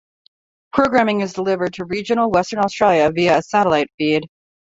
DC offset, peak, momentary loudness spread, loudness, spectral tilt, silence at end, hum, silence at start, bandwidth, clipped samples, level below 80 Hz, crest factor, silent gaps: under 0.1%; -2 dBFS; 7 LU; -18 LUFS; -5.5 dB/octave; 0.5 s; none; 0.75 s; 8 kHz; under 0.1%; -52 dBFS; 18 dB; 3.94-3.98 s